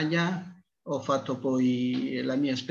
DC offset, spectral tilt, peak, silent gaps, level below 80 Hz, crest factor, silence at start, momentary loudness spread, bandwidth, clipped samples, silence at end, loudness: under 0.1%; -6 dB/octave; -12 dBFS; none; -72 dBFS; 16 dB; 0 s; 10 LU; 7.6 kHz; under 0.1%; 0 s; -29 LUFS